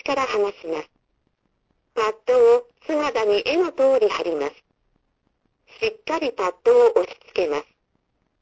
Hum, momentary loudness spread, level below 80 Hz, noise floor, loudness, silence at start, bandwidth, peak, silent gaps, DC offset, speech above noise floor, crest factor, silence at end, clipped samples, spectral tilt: none; 12 LU; -62 dBFS; -70 dBFS; -21 LUFS; 0.05 s; 8 kHz; -4 dBFS; none; under 0.1%; 50 dB; 18 dB; 0.8 s; under 0.1%; -3.5 dB/octave